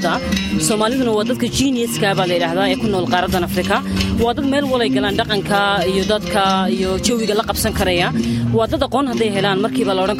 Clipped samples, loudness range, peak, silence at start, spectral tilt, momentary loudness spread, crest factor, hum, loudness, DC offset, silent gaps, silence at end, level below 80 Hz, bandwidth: under 0.1%; 1 LU; -2 dBFS; 0 s; -4.5 dB/octave; 2 LU; 16 dB; none; -17 LUFS; under 0.1%; none; 0 s; -36 dBFS; 16.5 kHz